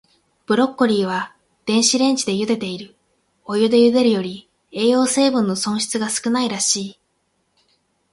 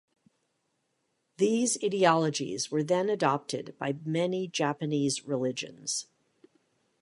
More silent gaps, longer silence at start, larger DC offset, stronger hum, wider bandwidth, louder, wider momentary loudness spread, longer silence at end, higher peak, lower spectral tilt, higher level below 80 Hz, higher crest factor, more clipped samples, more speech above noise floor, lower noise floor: neither; second, 0.5 s vs 1.4 s; neither; neither; about the same, 11.5 kHz vs 11.5 kHz; first, -18 LUFS vs -29 LUFS; first, 15 LU vs 10 LU; first, 1.2 s vs 1 s; first, -2 dBFS vs -8 dBFS; about the same, -3.5 dB/octave vs -4 dB/octave; first, -64 dBFS vs -76 dBFS; second, 16 dB vs 22 dB; neither; about the same, 50 dB vs 49 dB; second, -68 dBFS vs -77 dBFS